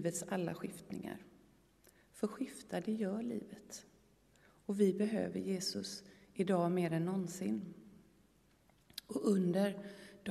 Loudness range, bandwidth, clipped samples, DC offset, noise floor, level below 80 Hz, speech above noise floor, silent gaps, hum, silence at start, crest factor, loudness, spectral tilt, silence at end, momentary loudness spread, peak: 7 LU; 13.5 kHz; under 0.1%; under 0.1%; -70 dBFS; -76 dBFS; 33 dB; none; none; 0 s; 20 dB; -38 LUFS; -6 dB/octave; 0 s; 18 LU; -20 dBFS